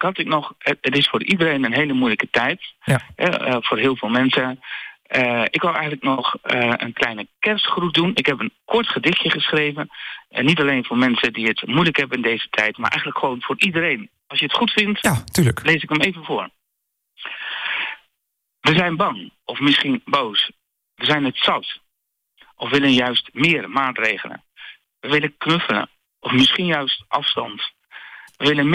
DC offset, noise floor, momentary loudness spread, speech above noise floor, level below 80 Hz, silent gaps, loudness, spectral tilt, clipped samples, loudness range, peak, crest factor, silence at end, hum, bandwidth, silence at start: under 0.1%; -77 dBFS; 11 LU; 57 dB; -56 dBFS; none; -19 LUFS; -4.5 dB/octave; under 0.1%; 2 LU; -6 dBFS; 16 dB; 0 s; none; 15.5 kHz; 0 s